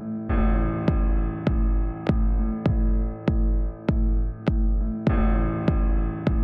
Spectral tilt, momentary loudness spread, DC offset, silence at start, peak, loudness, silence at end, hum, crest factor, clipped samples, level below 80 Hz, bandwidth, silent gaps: -10 dB/octave; 3 LU; under 0.1%; 0 s; -10 dBFS; -25 LUFS; 0 s; none; 12 dB; under 0.1%; -24 dBFS; 4.6 kHz; none